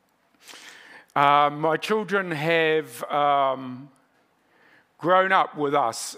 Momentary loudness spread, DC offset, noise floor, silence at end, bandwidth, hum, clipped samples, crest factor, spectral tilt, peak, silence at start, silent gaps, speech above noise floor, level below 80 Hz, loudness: 22 LU; under 0.1%; -64 dBFS; 0 s; 16 kHz; none; under 0.1%; 20 dB; -4 dB/octave; -4 dBFS; 0.5 s; none; 42 dB; -84 dBFS; -22 LUFS